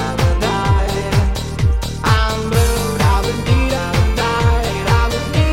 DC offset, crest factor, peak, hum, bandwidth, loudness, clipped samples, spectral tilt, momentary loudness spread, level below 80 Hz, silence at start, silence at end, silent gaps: under 0.1%; 14 dB; -2 dBFS; none; 16.5 kHz; -16 LUFS; under 0.1%; -5.5 dB/octave; 3 LU; -20 dBFS; 0 s; 0 s; none